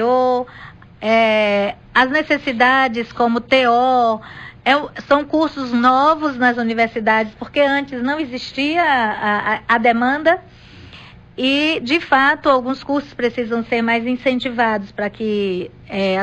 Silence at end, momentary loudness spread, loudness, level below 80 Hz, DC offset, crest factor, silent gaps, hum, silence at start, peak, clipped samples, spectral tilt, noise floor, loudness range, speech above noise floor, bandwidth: 0 s; 8 LU; -17 LUFS; -50 dBFS; under 0.1%; 14 dB; none; none; 0 s; -4 dBFS; under 0.1%; -5.5 dB/octave; -41 dBFS; 2 LU; 24 dB; 9 kHz